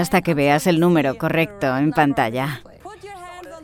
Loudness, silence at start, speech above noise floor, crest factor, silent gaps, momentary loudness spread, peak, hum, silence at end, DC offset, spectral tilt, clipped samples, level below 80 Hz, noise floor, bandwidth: -19 LUFS; 0 s; 20 dB; 16 dB; none; 20 LU; -4 dBFS; none; 0 s; under 0.1%; -6 dB/octave; under 0.1%; -50 dBFS; -38 dBFS; 18.5 kHz